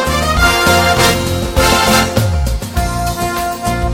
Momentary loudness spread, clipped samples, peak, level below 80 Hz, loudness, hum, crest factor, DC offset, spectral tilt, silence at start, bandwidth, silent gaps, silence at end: 8 LU; under 0.1%; 0 dBFS; -22 dBFS; -13 LUFS; none; 12 dB; under 0.1%; -4 dB/octave; 0 s; 17 kHz; none; 0 s